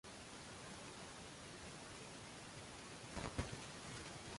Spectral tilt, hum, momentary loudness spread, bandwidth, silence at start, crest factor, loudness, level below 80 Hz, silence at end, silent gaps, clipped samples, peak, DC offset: -3.5 dB/octave; none; 6 LU; 11.5 kHz; 0.05 s; 24 dB; -51 LUFS; -62 dBFS; 0 s; none; under 0.1%; -28 dBFS; under 0.1%